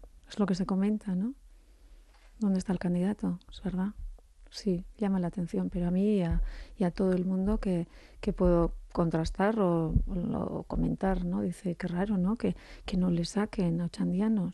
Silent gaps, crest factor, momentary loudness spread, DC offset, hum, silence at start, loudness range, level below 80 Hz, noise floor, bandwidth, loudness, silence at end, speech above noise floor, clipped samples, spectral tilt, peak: none; 18 dB; 9 LU; under 0.1%; none; 0 s; 4 LU; -42 dBFS; -55 dBFS; 11.5 kHz; -31 LUFS; 0 s; 26 dB; under 0.1%; -8 dB/octave; -12 dBFS